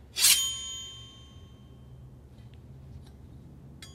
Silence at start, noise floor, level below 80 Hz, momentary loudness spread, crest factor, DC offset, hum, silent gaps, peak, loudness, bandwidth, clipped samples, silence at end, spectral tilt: 0 s; -50 dBFS; -54 dBFS; 30 LU; 28 dB; under 0.1%; none; none; -6 dBFS; -24 LUFS; 16 kHz; under 0.1%; 0 s; 0.5 dB/octave